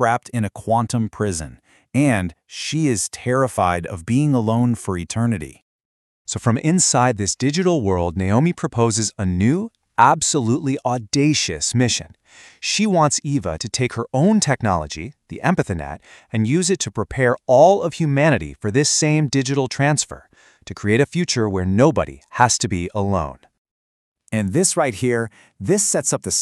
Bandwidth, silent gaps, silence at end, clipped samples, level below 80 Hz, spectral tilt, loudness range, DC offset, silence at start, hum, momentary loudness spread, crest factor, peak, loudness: 13 kHz; 5.62-5.79 s, 5.85-6.25 s, 23.58-23.65 s, 23.71-24.15 s; 0 s; under 0.1%; -46 dBFS; -4.5 dB/octave; 4 LU; under 0.1%; 0 s; none; 10 LU; 20 dB; 0 dBFS; -19 LUFS